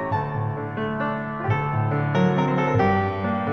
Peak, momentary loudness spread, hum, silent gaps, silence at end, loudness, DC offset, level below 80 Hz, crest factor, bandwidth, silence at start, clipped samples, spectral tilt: -8 dBFS; 7 LU; none; none; 0 s; -23 LUFS; 0.2%; -50 dBFS; 14 dB; 6.4 kHz; 0 s; under 0.1%; -8.5 dB/octave